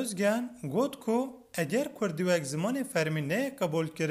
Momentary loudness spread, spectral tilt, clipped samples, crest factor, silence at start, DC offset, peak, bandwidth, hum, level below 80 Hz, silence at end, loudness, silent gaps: 4 LU; -5.5 dB/octave; under 0.1%; 14 dB; 0 s; under 0.1%; -16 dBFS; 16 kHz; none; -72 dBFS; 0 s; -31 LUFS; none